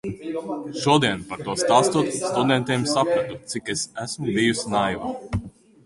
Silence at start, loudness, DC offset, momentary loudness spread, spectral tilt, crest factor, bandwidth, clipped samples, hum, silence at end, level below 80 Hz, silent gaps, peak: 0.05 s; -23 LUFS; under 0.1%; 11 LU; -4.5 dB/octave; 20 dB; 11.5 kHz; under 0.1%; none; 0.35 s; -48 dBFS; none; -4 dBFS